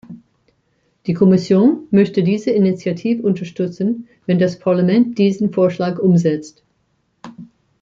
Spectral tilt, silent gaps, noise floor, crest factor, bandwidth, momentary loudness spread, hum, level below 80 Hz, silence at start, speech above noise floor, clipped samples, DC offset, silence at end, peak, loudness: -8.5 dB/octave; none; -65 dBFS; 14 dB; 7.4 kHz; 10 LU; none; -60 dBFS; 0.1 s; 49 dB; under 0.1%; under 0.1%; 0.4 s; -2 dBFS; -16 LUFS